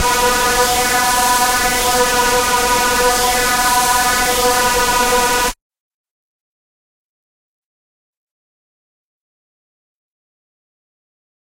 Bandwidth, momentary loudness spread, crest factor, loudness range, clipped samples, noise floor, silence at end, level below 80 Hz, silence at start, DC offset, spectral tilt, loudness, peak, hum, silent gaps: 16 kHz; 1 LU; 16 dB; 7 LU; under 0.1%; under -90 dBFS; 6.05 s; -36 dBFS; 0 s; under 0.1%; -1 dB/octave; -13 LUFS; -2 dBFS; none; none